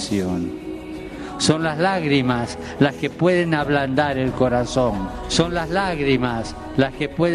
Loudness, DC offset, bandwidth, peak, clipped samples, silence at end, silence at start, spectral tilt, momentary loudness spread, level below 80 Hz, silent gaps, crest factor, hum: -21 LUFS; under 0.1%; 13 kHz; -2 dBFS; under 0.1%; 0 s; 0 s; -5.5 dB/octave; 10 LU; -40 dBFS; none; 18 dB; none